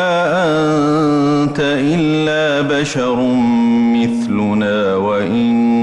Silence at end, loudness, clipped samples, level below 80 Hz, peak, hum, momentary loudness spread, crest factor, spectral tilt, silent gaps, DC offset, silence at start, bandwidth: 0 s; -14 LUFS; under 0.1%; -48 dBFS; -6 dBFS; none; 3 LU; 8 dB; -6 dB/octave; none; under 0.1%; 0 s; 11 kHz